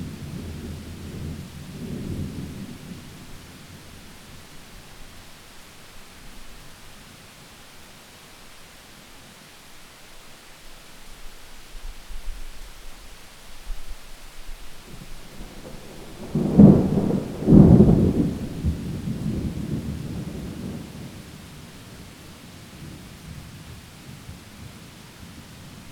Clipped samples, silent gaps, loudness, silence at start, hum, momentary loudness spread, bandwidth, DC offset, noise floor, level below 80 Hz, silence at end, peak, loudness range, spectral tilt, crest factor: under 0.1%; none; -21 LUFS; 0 s; none; 24 LU; 17 kHz; under 0.1%; -46 dBFS; -38 dBFS; 0 s; 0 dBFS; 27 LU; -8 dB/octave; 26 dB